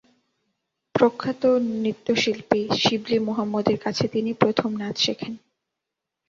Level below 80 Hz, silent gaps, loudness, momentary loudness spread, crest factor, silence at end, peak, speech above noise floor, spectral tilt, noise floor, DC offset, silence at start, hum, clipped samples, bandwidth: -60 dBFS; none; -23 LUFS; 6 LU; 22 dB; 0.9 s; -2 dBFS; 62 dB; -5 dB/octave; -84 dBFS; under 0.1%; 0.95 s; none; under 0.1%; 7.6 kHz